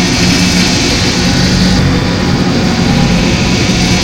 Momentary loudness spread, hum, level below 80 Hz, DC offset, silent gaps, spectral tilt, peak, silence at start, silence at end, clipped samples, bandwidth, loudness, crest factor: 3 LU; none; -22 dBFS; 0.8%; none; -4.5 dB/octave; 0 dBFS; 0 s; 0 s; under 0.1%; 16.5 kHz; -10 LUFS; 10 dB